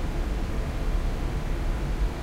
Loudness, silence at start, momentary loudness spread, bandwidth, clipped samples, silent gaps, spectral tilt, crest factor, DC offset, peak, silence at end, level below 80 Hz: -31 LUFS; 0 s; 1 LU; 14 kHz; under 0.1%; none; -6.5 dB/octave; 10 dB; under 0.1%; -16 dBFS; 0 s; -28 dBFS